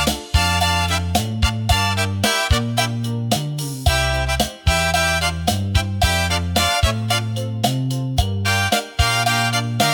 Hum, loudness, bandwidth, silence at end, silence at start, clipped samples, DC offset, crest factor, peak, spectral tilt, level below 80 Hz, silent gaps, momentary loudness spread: none; -19 LUFS; 18 kHz; 0 s; 0 s; under 0.1%; under 0.1%; 16 dB; -4 dBFS; -4 dB/octave; -28 dBFS; none; 5 LU